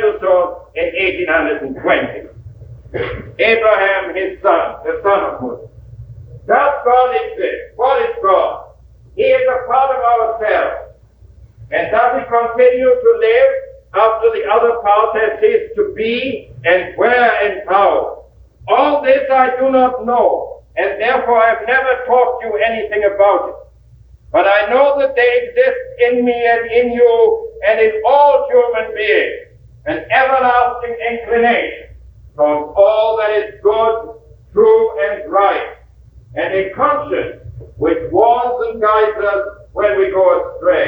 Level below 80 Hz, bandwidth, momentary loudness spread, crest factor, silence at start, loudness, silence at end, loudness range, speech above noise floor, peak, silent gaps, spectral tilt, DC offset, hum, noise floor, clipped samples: -44 dBFS; 5.4 kHz; 10 LU; 14 dB; 0 s; -14 LUFS; 0 s; 3 LU; 30 dB; 0 dBFS; none; -7.5 dB/octave; under 0.1%; none; -43 dBFS; under 0.1%